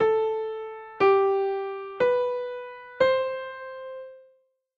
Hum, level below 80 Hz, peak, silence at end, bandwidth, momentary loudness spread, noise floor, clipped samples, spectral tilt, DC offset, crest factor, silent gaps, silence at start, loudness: none; -66 dBFS; -8 dBFS; 0.55 s; 7.2 kHz; 17 LU; -65 dBFS; under 0.1%; -6 dB/octave; under 0.1%; 18 dB; none; 0 s; -25 LUFS